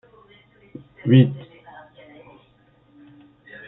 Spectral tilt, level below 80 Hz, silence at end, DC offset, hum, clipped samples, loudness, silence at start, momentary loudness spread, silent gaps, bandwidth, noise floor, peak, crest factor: -12 dB/octave; -64 dBFS; 2.25 s; under 0.1%; none; under 0.1%; -18 LUFS; 1.05 s; 29 LU; none; 4 kHz; -57 dBFS; -2 dBFS; 22 dB